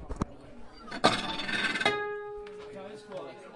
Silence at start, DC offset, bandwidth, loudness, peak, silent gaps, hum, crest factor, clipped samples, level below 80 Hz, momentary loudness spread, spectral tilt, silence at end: 0 s; under 0.1%; 11.5 kHz; -30 LUFS; -6 dBFS; none; none; 28 dB; under 0.1%; -50 dBFS; 17 LU; -3.5 dB/octave; 0 s